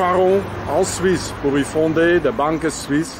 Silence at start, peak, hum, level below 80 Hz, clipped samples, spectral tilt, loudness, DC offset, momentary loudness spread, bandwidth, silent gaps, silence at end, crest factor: 0 s; -6 dBFS; none; -40 dBFS; under 0.1%; -5 dB/octave; -18 LUFS; under 0.1%; 5 LU; 16 kHz; none; 0 s; 12 dB